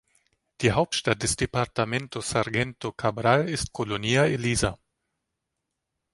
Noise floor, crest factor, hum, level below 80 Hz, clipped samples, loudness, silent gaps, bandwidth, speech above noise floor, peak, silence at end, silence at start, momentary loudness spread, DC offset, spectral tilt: -82 dBFS; 22 dB; none; -46 dBFS; under 0.1%; -25 LUFS; none; 11.5 kHz; 57 dB; -6 dBFS; 1.4 s; 0.6 s; 7 LU; under 0.1%; -4.5 dB/octave